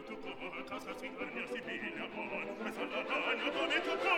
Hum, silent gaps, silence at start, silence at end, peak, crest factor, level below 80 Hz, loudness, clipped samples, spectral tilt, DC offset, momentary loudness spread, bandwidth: none; none; 0 s; 0 s; -18 dBFS; 20 dB; -68 dBFS; -38 LUFS; under 0.1%; -3.5 dB/octave; under 0.1%; 10 LU; 19 kHz